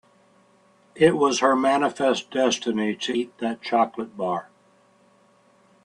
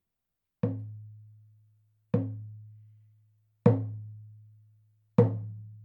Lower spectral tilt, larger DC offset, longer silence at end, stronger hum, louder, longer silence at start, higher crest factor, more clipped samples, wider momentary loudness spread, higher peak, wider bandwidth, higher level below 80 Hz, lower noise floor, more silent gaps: second, -4 dB/octave vs -11.5 dB/octave; neither; first, 1.4 s vs 0 s; neither; first, -23 LUFS vs -30 LUFS; first, 0.95 s vs 0.65 s; second, 20 dB vs 26 dB; neither; second, 9 LU vs 24 LU; about the same, -4 dBFS vs -6 dBFS; first, 11 kHz vs 4.2 kHz; about the same, -68 dBFS vs -72 dBFS; second, -59 dBFS vs -86 dBFS; neither